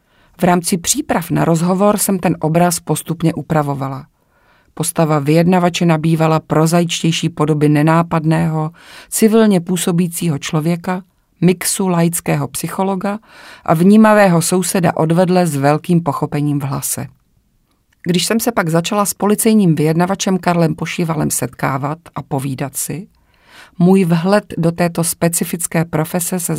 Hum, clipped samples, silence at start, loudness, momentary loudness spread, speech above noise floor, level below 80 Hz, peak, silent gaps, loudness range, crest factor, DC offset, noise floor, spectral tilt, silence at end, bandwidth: none; under 0.1%; 0.4 s; -15 LUFS; 9 LU; 45 dB; -50 dBFS; 0 dBFS; none; 5 LU; 14 dB; under 0.1%; -59 dBFS; -5.5 dB/octave; 0 s; 16.5 kHz